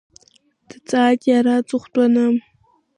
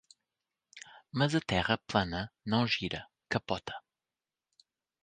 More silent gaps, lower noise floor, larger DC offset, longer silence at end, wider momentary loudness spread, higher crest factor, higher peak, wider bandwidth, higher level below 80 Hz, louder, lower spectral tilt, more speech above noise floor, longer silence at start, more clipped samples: neither; second, -57 dBFS vs under -90 dBFS; neither; second, 0.6 s vs 1.25 s; second, 7 LU vs 17 LU; second, 14 dB vs 24 dB; first, -6 dBFS vs -10 dBFS; about the same, 10.5 kHz vs 9.6 kHz; second, -68 dBFS vs -56 dBFS; first, -17 LUFS vs -32 LUFS; about the same, -5 dB/octave vs -5.5 dB/octave; second, 41 dB vs over 58 dB; first, 0.9 s vs 0.75 s; neither